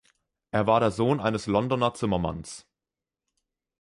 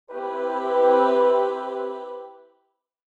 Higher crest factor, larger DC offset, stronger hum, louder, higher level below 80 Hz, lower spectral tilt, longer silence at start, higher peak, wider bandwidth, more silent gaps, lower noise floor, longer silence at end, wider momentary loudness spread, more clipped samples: about the same, 20 dB vs 16 dB; neither; neither; second, -26 LUFS vs -22 LUFS; first, -52 dBFS vs -70 dBFS; first, -6.5 dB/octave vs -4 dB/octave; first, 0.55 s vs 0.1 s; about the same, -8 dBFS vs -6 dBFS; first, 11.5 kHz vs 7.2 kHz; neither; first, -90 dBFS vs -72 dBFS; first, 1.2 s vs 0.85 s; second, 14 LU vs 17 LU; neither